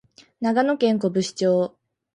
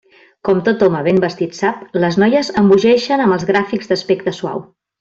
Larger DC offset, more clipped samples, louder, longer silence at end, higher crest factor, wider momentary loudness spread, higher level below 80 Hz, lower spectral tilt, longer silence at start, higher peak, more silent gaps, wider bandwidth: neither; neither; second, -22 LUFS vs -15 LUFS; about the same, 0.5 s vs 0.4 s; about the same, 16 dB vs 14 dB; second, 6 LU vs 9 LU; second, -68 dBFS vs -54 dBFS; about the same, -5.5 dB/octave vs -6.5 dB/octave; about the same, 0.4 s vs 0.45 s; second, -6 dBFS vs -2 dBFS; neither; first, 11 kHz vs 7.8 kHz